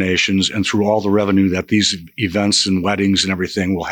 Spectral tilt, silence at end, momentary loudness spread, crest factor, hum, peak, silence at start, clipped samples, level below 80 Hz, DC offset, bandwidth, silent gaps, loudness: -4 dB/octave; 0 s; 5 LU; 14 dB; none; -4 dBFS; 0 s; under 0.1%; -52 dBFS; under 0.1%; 18 kHz; none; -16 LUFS